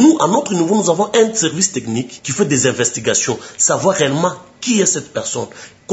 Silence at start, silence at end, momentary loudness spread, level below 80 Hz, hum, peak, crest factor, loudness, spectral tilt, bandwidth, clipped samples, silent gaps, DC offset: 0 s; 0 s; 9 LU; -60 dBFS; none; 0 dBFS; 16 dB; -16 LUFS; -3.5 dB/octave; 8.2 kHz; under 0.1%; none; under 0.1%